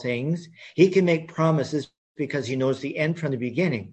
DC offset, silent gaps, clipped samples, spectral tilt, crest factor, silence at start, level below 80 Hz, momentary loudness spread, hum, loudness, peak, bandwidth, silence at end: under 0.1%; 1.97-2.15 s; under 0.1%; -7 dB/octave; 20 dB; 0 s; -64 dBFS; 12 LU; none; -24 LUFS; -4 dBFS; 8.6 kHz; 0 s